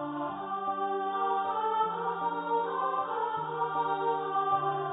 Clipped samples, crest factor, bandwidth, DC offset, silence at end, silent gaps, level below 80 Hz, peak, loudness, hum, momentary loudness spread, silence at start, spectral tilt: under 0.1%; 14 dB; 3.9 kHz; under 0.1%; 0 s; none; -76 dBFS; -16 dBFS; -31 LUFS; none; 4 LU; 0 s; -0.5 dB/octave